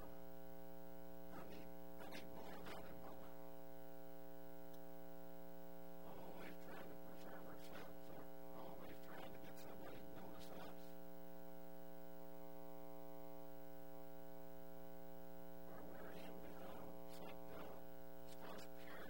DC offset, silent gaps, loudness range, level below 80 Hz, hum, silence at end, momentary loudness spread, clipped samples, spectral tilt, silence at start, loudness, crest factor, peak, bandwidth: 0.4%; none; 2 LU; -72 dBFS; 60 Hz at -65 dBFS; 0 s; 3 LU; under 0.1%; -5.5 dB/octave; 0 s; -58 LUFS; 18 dB; -36 dBFS; over 20 kHz